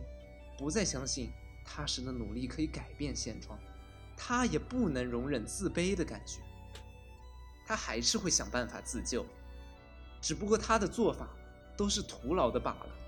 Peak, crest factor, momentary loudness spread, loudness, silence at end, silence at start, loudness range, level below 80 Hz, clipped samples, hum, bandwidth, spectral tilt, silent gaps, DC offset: -14 dBFS; 22 dB; 21 LU; -35 LUFS; 0 s; 0 s; 4 LU; -48 dBFS; under 0.1%; none; 19 kHz; -3.5 dB/octave; none; under 0.1%